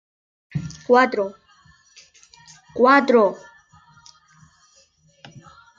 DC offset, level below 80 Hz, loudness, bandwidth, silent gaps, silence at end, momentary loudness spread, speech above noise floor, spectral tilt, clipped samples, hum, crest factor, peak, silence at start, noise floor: under 0.1%; -62 dBFS; -19 LUFS; 7.6 kHz; none; 0.4 s; 18 LU; 40 dB; -6 dB/octave; under 0.1%; none; 20 dB; -2 dBFS; 0.55 s; -58 dBFS